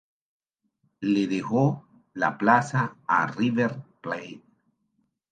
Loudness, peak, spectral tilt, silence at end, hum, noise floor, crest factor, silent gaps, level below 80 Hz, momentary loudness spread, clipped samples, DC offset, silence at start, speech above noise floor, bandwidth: -25 LUFS; -4 dBFS; -7 dB/octave; 0.95 s; none; -74 dBFS; 22 dB; none; -72 dBFS; 15 LU; under 0.1%; under 0.1%; 1 s; 49 dB; 9.2 kHz